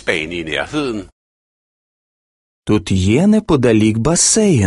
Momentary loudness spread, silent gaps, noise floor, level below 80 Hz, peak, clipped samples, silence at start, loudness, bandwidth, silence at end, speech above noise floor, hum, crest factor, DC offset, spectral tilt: 10 LU; 1.12-2.62 s; under -90 dBFS; -36 dBFS; 0 dBFS; under 0.1%; 0.05 s; -14 LUFS; 11.5 kHz; 0 s; over 76 dB; none; 16 dB; under 0.1%; -4.5 dB/octave